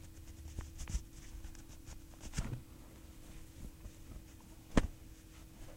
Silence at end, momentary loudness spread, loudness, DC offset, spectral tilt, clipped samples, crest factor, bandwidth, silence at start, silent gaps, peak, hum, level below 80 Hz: 0 s; 19 LU; -46 LUFS; under 0.1%; -5.5 dB/octave; under 0.1%; 30 dB; 16 kHz; 0 s; none; -14 dBFS; none; -46 dBFS